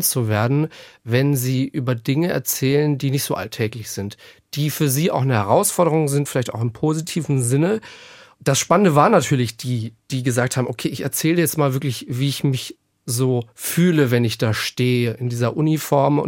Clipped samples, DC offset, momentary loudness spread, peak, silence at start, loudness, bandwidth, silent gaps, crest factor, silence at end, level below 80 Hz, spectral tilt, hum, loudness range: under 0.1%; under 0.1%; 9 LU; -2 dBFS; 0 s; -20 LUFS; 17 kHz; none; 18 dB; 0 s; -60 dBFS; -5.5 dB/octave; none; 3 LU